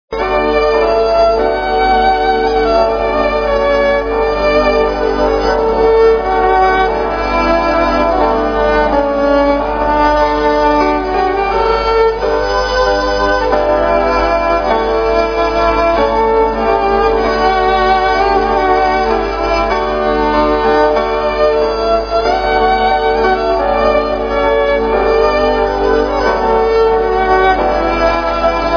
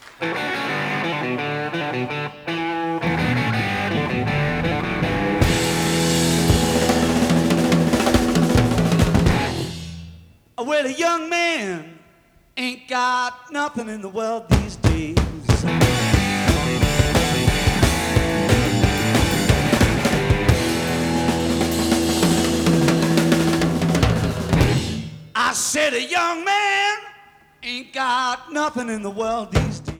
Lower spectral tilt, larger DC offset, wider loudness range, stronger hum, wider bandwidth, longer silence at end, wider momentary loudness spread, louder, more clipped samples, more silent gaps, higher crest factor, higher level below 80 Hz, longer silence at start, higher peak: about the same, -5.5 dB/octave vs -5 dB/octave; first, 0.1% vs under 0.1%; second, 1 LU vs 5 LU; neither; second, 5.4 kHz vs 18.5 kHz; about the same, 0 s vs 0 s; second, 3 LU vs 9 LU; first, -12 LUFS vs -20 LUFS; neither; neither; second, 12 dB vs 20 dB; first, -26 dBFS vs -32 dBFS; about the same, 0.1 s vs 0.05 s; about the same, 0 dBFS vs 0 dBFS